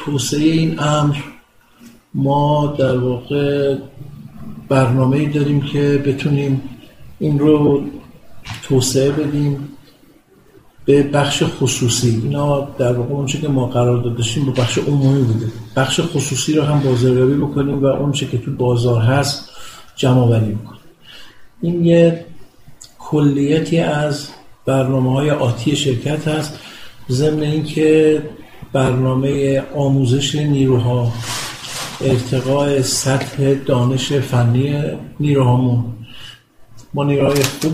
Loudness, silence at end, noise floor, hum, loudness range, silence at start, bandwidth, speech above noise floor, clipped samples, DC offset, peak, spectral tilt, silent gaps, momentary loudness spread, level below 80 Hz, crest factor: -16 LUFS; 0 s; -49 dBFS; none; 2 LU; 0 s; 15.5 kHz; 33 dB; under 0.1%; under 0.1%; 0 dBFS; -6 dB/octave; none; 12 LU; -44 dBFS; 16 dB